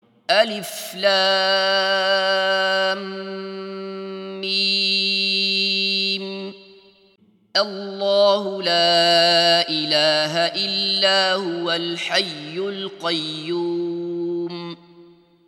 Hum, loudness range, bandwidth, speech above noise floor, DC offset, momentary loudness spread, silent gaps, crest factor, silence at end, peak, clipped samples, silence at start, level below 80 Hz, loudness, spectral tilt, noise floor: none; 6 LU; 16 kHz; 37 dB; under 0.1%; 15 LU; none; 20 dB; 0.45 s; -2 dBFS; under 0.1%; 0.3 s; -78 dBFS; -19 LUFS; -3 dB/octave; -57 dBFS